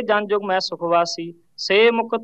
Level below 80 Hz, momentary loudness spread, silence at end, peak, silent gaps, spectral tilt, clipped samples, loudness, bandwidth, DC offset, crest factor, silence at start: -78 dBFS; 14 LU; 0 s; -4 dBFS; none; -3.5 dB/octave; under 0.1%; -19 LUFS; 8.2 kHz; 0.1%; 16 dB; 0 s